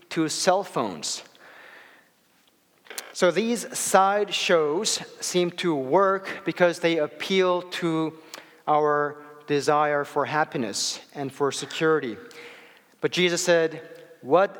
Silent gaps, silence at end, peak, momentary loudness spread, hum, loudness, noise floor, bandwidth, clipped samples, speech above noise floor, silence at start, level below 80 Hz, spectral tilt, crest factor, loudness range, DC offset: none; 0 s; -4 dBFS; 14 LU; none; -24 LUFS; -63 dBFS; 19 kHz; under 0.1%; 39 dB; 0.1 s; -80 dBFS; -3.5 dB/octave; 22 dB; 4 LU; under 0.1%